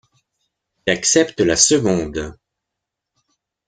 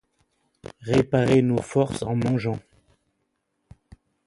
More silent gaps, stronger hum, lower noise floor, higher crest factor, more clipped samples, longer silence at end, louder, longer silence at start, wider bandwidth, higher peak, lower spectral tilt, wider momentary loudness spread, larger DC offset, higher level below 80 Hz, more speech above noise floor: neither; neither; first, -82 dBFS vs -75 dBFS; about the same, 20 dB vs 20 dB; neither; second, 1.35 s vs 1.65 s; first, -16 LUFS vs -23 LUFS; first, 0.85 s vs 0.65 s; about the same, 10.5 kHz vs 11.5 kHz; first, 0 dBFS vs -6 dBFS; second, -3 dB/octave vs -7 dB/octave; second, 14 LU vs 18 LU; neither; first, -46 dBFS vs -52 dBFS; first, 65 dB vs 53 dB